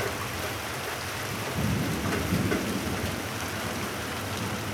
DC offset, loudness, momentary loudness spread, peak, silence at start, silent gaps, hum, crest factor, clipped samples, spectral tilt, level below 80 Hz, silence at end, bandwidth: under 0.1%; -30 LUFS; 5 LU; -14 dBFS; 0 s; none; none; 16 dB; under 0.1%; -4.5 dB/octave; -46 dBFS; 0 s; 19 kHz